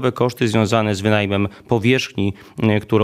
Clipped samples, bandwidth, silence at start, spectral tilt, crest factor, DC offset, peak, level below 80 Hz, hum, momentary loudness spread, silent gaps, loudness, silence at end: under 0.1%; 15 kHz; 0 s; -6 dB/octave; 18 dB; under 0.1%; 0 dBFS; -52 dBFS; none; 6 LU; none; -19 LUFS; 0 s